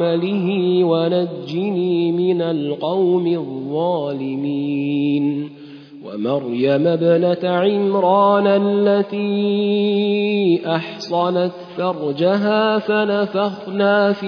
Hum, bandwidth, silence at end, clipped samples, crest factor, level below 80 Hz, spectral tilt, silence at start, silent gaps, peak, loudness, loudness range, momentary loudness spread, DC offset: none; 5.4 kHz; 0 s; under 0.1%; 14 dB; -70 dBFS; -8 dB/octave; 0 s; none; -4 dBFS; -18 LUFS; 4 LU; 8 LU; under 0.1%